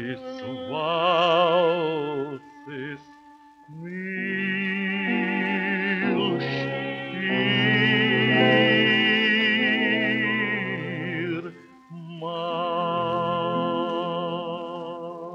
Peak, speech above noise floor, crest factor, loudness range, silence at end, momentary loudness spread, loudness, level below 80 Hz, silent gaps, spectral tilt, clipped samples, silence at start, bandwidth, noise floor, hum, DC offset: -6 dBFS; 25 dB; 18 dB; 8 LU; 0 s; 16 LU; -23 LUFS; -68 dBFS; none; -6.5 dB/octave; under 0.1%; 0 s; 7.6 kHz; -51 dBFS; none; under 0.1%